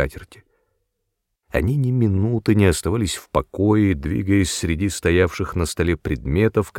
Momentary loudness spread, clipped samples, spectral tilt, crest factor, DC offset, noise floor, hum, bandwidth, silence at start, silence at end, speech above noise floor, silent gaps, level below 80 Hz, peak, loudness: 7 LU; under 0.1%; -6 dB/octave; 18 dB; under 0.1%; -76 dBFS; none; 16.5 kHz; 0 s; 0 s; 57 dB; none; -34 dBFS; -2 dBFS; -20 LUFS